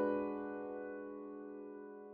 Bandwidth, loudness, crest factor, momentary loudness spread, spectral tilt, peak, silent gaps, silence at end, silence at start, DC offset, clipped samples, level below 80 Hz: 4.3 kHz; -45 LUFS; 16 dB; 11 LU; -6.5 dB/octave; -26 dBFS; none; 0 s; 0 s; under 0.1%; under 0.1%; -78 dBFS